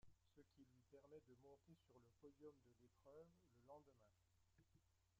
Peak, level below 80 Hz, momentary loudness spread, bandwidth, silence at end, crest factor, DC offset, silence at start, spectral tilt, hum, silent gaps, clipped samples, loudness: -52 dBFS; -88 dBFS; 2 LU; 7.4 kHz; 0 s; 18 dB; under 0.1%; 0 s; -7 dB/octave; none; none; under 0.1%; -68 LUFS